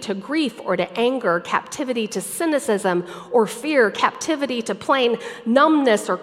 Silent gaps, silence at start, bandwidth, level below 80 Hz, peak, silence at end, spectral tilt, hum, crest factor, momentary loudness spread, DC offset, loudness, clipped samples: none; 0 s; 16 kHz; -70 dBFS; -2 dBFS; 0 s; -4 dB/octave; none; 20 dB; 7 LU; under 0.1%; -20 LUFS; under 0.1%